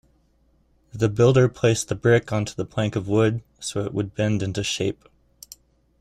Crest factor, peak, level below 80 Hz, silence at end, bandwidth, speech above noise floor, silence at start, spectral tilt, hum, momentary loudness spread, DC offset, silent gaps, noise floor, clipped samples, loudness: 18 dB; -6 dBFS; -52 dBFS; 1.1 s; 14 kHz; 41 dB; 0.95 s; -5.5 dB/octave; none; 17 LU; under 0.1%; none; -62 dBFS; under 0.1%; -22 LUFS